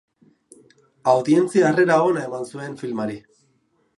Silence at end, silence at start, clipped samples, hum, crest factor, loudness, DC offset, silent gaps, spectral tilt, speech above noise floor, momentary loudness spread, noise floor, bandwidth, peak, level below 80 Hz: 0.8 s; 1.05 s; under 0.1%; none; 18 dB; -20 LUFS; under 0.1%; none; -6.5 dB/octave; 46 dB; 14 LU; -65 dBFS; 11.5 kHz; -4 dBFS; -70 dBFS